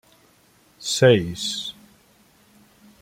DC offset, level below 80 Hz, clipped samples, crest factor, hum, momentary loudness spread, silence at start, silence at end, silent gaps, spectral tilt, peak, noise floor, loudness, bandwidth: under 0.1%; -58 dBFS; under 0.1%; 22 dB; none; 16 LU; 0.8 s; 1.3 s; none; -4.5 dB/octave; -2 dBFS; -58 dBFS; -21 LUFS; 16 kHz